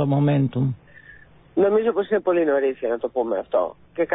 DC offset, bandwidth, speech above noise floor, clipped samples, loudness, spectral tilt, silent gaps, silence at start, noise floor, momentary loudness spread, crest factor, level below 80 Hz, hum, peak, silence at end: under 0.1%; 4 kHz; 27 dB; under 0.1%; -22 LUFS; -12.5 dB/octave; none; 0 s; -48 dBFS; 8 LU; 14 dB; -58 dBFS; none; -8 dBFS; 0 s